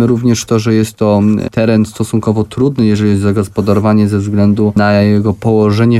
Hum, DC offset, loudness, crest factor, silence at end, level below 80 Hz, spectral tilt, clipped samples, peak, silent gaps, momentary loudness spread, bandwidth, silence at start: none; under 0.1%; -12 LUFS; 10 dB; 0 s; -42 dBFS; -7 dB/octave; under 0.1%; 0 dBFS; none; 4 LU; 13 kHz; 0 s